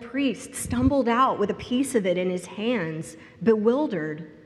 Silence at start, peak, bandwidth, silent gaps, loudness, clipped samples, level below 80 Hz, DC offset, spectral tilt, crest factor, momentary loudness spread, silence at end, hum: 0 s; -8 dBFS; 14 kHz; none; -25 LUFS; under 0.1%; -50 dBFS; under 0.1%; -5.5 dB/octave; 16 dB; 11 LU; 0.05 s; none